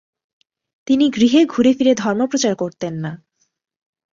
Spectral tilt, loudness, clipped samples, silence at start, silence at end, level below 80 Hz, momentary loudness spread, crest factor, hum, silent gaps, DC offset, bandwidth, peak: -5 dB/octave; -17 LUFS; under 0.1%; 0.9 s; 1 s; -60 dBFS; 13 LU; 16 dB; none; none; under 0.1%; 7.6 kHz; -2 dBFS